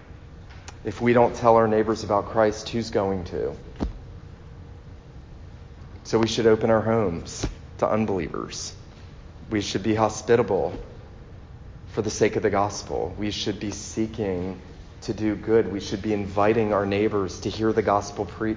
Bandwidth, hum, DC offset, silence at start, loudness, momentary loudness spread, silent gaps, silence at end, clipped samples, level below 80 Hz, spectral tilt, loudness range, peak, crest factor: 7.6 kHz; none; under 0.1%; 0 s; -24 LUFS; 24 LU; none; 0 s; under 0.1%; -44 dBFS; -5.5 dB/octave; 5 LU; -2 dBFS; 22 dB